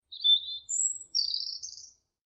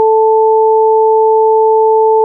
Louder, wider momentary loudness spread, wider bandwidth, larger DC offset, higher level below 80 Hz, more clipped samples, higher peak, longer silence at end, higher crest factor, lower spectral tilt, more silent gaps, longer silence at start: second, -27 LUFS vs -9 LUFS; first, 17 LU vs 0 LU; first, 8.8 kHz vs 1 kHz; neither; about the same, -78 dBFS vs -76 dBFS; neither; second, -14 dBFS vs -4 dBFS; first, 0.4 s vs 0 s; first, 16 dB vs 4 dB; second, 4.5 dB/octave vs -4 dB/octave; neither; about the same, 0.1 s vs 0 s